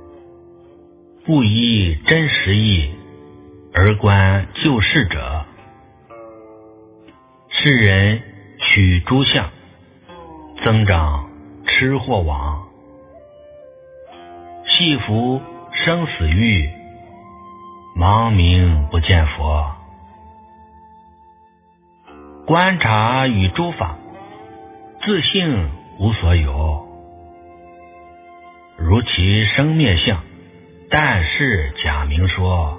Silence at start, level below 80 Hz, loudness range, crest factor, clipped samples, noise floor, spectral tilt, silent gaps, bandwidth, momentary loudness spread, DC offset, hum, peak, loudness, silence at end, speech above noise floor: 0.15 s; -26 dBFS; 6 LU; 18 dB; under 0.1%; -53 dBFS; -9.5 dB/octave; none; 3.9 kHz; 14 LU; under 0.1%; none; 0 dBFS; -16 LUFS; 0 s; 38 dB